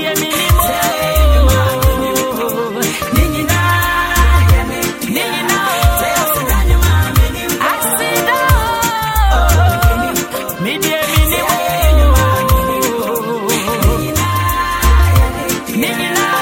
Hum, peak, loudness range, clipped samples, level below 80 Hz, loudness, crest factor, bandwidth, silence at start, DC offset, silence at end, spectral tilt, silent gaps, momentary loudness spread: none; 0 dBFS; 1 LU; under 0.1%; -16 dBFS; -13 LUFS; 12 dB; 17 kHz; 0 s; under 0.1%; 0 s; -4.5 dB/octave; none; 6 LU